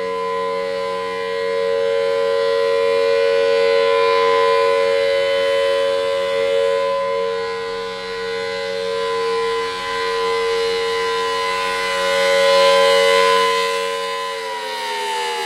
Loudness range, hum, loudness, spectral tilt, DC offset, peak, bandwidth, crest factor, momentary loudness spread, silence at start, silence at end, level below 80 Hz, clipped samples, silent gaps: 5 LU; none; -18 LUFS; -1.5 dB/octave; under 0.1%; -2 dBFS; 15 kHz; 16 dB; 10 LU; 0 s; 0 s; -56 dBFS; under 0.1%; none